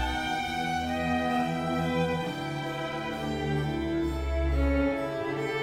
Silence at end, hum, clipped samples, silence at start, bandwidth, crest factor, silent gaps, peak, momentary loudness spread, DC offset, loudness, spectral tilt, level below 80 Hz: 0 s; none; under 0.1%; 0 s; 15.5 kHz; 14 dB; none; -16 dBFS; 6 LU; under 0.1%; -30 LUFS; -6 dB/octave; -36 dBFS